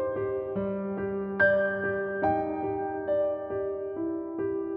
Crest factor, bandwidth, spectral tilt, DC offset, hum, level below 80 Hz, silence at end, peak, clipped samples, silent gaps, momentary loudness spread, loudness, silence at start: 16 dB; 5.2 kHz; -6 dB/octave; under 0.1%; none; -58 dBFS; 0 s; -12 dBFS; under 0.1%; none; 9 LU; -29 LUFS; 0 s